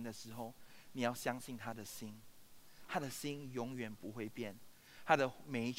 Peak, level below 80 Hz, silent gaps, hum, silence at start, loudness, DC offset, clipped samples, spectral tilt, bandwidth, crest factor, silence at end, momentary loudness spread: -14 dBFS; -74 dBFS; none; none; 0 s; -42 LUFS; under 0.1%; under 0.1%; -4.5 dB/octave; 16 kHz; 28 dB; 0 s; 18 LU